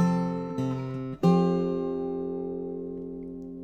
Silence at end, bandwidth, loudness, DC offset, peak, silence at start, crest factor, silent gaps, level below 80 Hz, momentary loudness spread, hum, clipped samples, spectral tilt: 0 s; 8.2 kHz; -29 LUFS; under 0.1%; -10 dBFS; 0 s; 18 dB; none; -58 dBFS; 14 LU; none; under 0.1%; -9 dB/octave